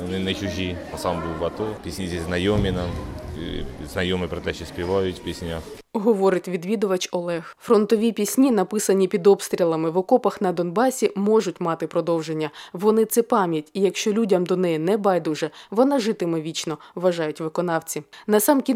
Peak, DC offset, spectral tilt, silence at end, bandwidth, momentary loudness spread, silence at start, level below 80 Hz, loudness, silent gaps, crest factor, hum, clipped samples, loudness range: -4 dBFS; under 0.1%; -5 dB/octave; 0 s; 17 kHz; 11 LU; 0 s; -44 dBFS; -23 LUFS; none; 18 dB; none; under 0.1%; 6 LU